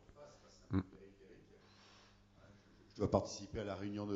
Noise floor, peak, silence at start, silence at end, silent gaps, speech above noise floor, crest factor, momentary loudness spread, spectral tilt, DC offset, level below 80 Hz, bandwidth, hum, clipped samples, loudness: -65 dBFS; -16 dBFS; 0.1 s; 0 s; none; 26 dB; 28 dB; 27 LU; -6.5 dB/octave; under 0.1%; -64 dBFS; 7.6 kHz; none; under 0.1%; -41 LUFS